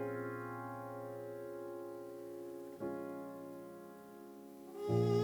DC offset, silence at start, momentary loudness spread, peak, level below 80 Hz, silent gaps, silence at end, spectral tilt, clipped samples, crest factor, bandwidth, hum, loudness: under 0.1%; 0 s; 14 LU; -22 dBFS; -76 dBFS; none; 0 s; -8 dB/octave; under 0.1%; 20 dB; over 20 kHz; none; -44 LUFS